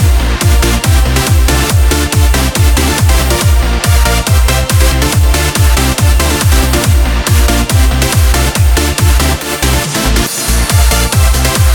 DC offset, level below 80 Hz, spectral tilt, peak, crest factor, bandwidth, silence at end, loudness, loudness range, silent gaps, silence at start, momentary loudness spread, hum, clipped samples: under 0.1%; -12 dBFS; -4 dB/octave; 0 dBFS; 8 dB; 19 kHz; 0 s; -10 LUFS; 1 LU; none; 0 s; 2 LU; none; under 0.1%